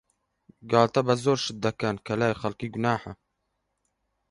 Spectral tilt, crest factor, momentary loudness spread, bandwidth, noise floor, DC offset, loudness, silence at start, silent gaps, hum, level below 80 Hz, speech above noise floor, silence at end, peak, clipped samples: -5.5 dB/octave; 24 dB; 9 LU; 11.5 kHz; -78 dBFS; under 0.1%; -26 LUFS; 0.65 s; none; none; -60 dBFS; 52 dB; 1.15 s; -4 dBFS; under 0.1%